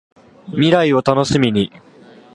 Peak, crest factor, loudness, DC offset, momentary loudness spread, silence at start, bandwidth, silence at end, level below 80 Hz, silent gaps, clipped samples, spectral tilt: 0 dBFS; 16 dB; -16 LUFS; under 0.1%; 10 LU; 0.45 s; 11.5 kHz; 0.7 s; -48 dBFS; none; under 0.1%; -6 dB/octave